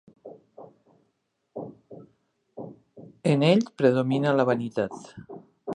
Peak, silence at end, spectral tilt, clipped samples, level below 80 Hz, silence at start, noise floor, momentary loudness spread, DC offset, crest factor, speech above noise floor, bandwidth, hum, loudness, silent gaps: -6 dBFS; 0 s; -7 dB/octave; under 0.1%; -70 dBFS; 0.25 s; -75 dBFS; 22 LU; under 0.1%; 22 dB; 52 dB; 10.5 kHz; none; -24 LUFS; none